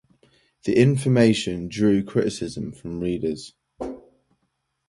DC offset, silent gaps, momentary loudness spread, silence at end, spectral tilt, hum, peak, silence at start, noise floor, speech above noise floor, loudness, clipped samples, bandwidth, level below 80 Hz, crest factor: under 0.1%; none; 17 LU; 0.9 s; -6.5 dB/octave; none; -4 dBFS; 0.65 s; -74 dBFS; 53 dB; -22 LUFS; under 0.1%; 11.5 kHz; -52 dBFS; 20 dB